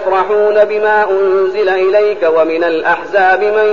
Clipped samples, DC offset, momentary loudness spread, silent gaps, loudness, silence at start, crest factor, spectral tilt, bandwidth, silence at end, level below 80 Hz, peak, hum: under 0.1%; 1%; 3 LU; none; -11 LUFS; 0 s; 12 dB; -5.5 dB/octave; 7 kHz; 0 s; -52 dBFS; 0 dBFS; none